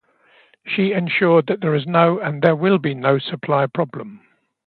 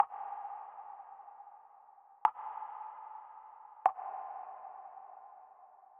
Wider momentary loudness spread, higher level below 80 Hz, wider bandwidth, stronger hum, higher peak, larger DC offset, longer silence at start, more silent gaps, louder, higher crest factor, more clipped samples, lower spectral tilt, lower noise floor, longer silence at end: second, 10 LU vs 23 LU; first, -66 dBFS vs under -90 dBFS; first, 4.7 kHz vs 3.6 kHz; neither; first, 0 dBFS vs -10 dBFS; neither; first, 0.65 s vs 0 s; neither; first, -18 LUFS vs -40 LUFS; second, 18 dB vs 30 dB; neither; first, -10 dB/octave vs 7 dB/octave; second, -55 dBFS vs -60 dBFS; first, 0.5 s vs 0 s